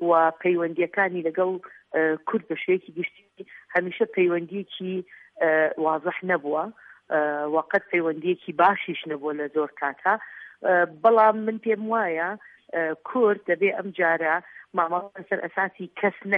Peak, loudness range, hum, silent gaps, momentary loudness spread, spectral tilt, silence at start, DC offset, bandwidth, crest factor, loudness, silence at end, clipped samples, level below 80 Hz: -6 dBFS; 4 LU; none; none; 10 LU; -8.5 dB/octave; 0 s; under 0.1%; 4.6 kHz; 18 dB; -25 LUFS; 0 s; under 0.1%; -78 dBFS